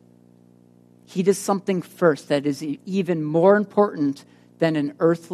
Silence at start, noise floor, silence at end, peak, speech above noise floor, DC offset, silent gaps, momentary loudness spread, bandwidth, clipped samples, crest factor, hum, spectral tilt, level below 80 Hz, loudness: 1.1 s; -53 dBFS; 0 s; -4 dBFS; 32 dB; under 0.1%; none; 9 LU; 13 kHz; under 0.1%; 20 dB; 60 Hz at -45 dBFS; -6.5 dB/octave; -72 dBFS; -22 LUFS